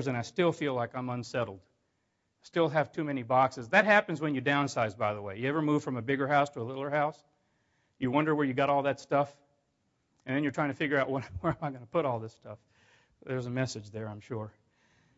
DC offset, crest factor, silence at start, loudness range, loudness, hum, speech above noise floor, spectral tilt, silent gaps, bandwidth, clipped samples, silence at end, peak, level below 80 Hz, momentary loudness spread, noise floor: under 0.1%; 22 dB; 0 s; 6 LU; -30 LUFS; none; 48 dB; -6 dB/octave; none; 8 kHz; under 0.1%; 0.7 s; -10 dBFS; -66 dBFS; 12 LU; -78 dBFS